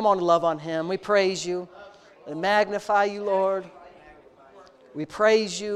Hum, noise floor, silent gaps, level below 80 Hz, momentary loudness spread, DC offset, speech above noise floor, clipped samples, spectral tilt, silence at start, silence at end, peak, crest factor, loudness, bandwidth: none; -51 dBFS; none; -66 dBFS; 15 LU; under 0.1%; 28 dB; under 0.1%; -4 dB/octave; 0 s; 0 s; -6 dBFS; 18 dB; -24 LUFS; 12 kHz